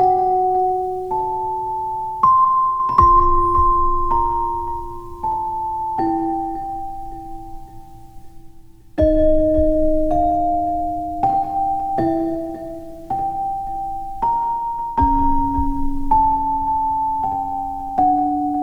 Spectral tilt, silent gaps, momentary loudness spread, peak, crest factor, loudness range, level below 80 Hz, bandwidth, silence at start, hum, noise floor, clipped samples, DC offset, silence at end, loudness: -9.5 dB/octave; none; 12 LU; 0 dBFS; 18 dB; 8 LU; -28 dBFS; 6 kHz; 0 s; none; -41 dBFS; under 0.1%; under 0.1%; 0 s; -19 LUFS